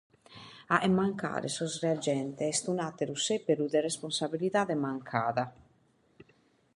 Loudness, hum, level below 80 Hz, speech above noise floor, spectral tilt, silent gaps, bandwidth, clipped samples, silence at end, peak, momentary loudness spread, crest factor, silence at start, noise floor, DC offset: -31 LUFS; none; -70 dBFS; 37 dB; -4.5 dB/octave; none; 11.5 kHz; under 0.1%; 1.25 s; -8 dBFS; 6 LU; 24 dB; 0.3 s; -68 dBFS; under 0.1%